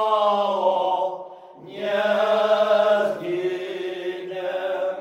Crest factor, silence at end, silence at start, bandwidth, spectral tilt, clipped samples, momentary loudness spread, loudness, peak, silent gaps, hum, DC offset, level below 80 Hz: 14 dB; 0 s; 0 s; 12 kHz; -5 dB/octave; under 0.1%; 12 LU; -22 LUFS; -8 dBFS; none; none; under 0.1%; -76 dBFS